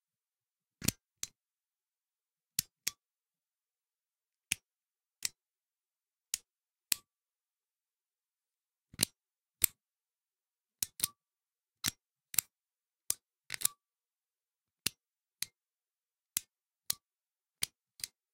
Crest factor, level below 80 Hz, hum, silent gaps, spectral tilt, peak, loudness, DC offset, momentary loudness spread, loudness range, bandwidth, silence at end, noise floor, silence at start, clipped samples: 40 dB; -70 dBFS; none; none; -0.5 dB/octave; -4 dBFS; -37 LUFS; under 0.1%; 10 LU; 6 LU; 16.5 kHz; 0.3 s; under -90 dBFS; 0.8 s; under 0.1%